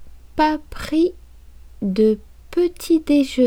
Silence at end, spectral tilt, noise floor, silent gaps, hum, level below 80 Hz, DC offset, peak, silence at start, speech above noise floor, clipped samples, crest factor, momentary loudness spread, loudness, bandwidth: 0 s; -6 dB/octave; -42 dBFS; none; none; -42 dBFS; under 0.1%; -4 dBFS; 0 s; 24 dB; under 0.1%; 16 dB; 10 LU; -20 LUFS; 17.5 kHz